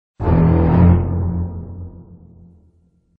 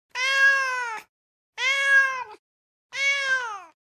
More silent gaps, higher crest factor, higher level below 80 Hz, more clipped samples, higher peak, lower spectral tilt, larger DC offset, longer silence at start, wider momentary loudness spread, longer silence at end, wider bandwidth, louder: second, none vs 1.09-1.53 s, 2.39-2.90 s; about the same, 16 dB vs 16 dB; first, -28 dBFS vs -78 dBFS; neither; first, 0 dBFS vs -10 dBFS; first, -13 dB/octave vs 3 dB/octave; neither; about the same, 0.2 s vs 0.15 s; first, 21 LU vs 18 LU; first, 1.2 s vs 0.25 s; second, 3.3 kHz vs 14.5 kHz; first, -16 LUFS vs -21 LUFS